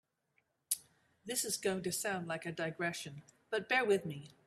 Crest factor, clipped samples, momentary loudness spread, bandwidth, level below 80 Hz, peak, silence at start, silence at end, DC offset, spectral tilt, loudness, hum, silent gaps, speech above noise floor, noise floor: 20 dB; under 0.1%; 13 LU; 15.5 kHz; -78 dBFS; -18 dBFS; 0.7 s; 0.15 s; under 0.1%; -3 dB/octave; -37 LUFS; none; none; 42 dB; -80 dBFS